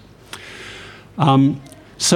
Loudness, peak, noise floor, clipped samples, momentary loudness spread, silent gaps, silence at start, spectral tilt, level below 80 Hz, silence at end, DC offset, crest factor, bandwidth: -17 LUFS; -2 dBFS; -38 dBFS; under 0.1%; 22 LU; none; 0.35 s; -4.5 dB/octave; -54 dBFS; 0 s; under 0.1%; 18 dB; 16 kHz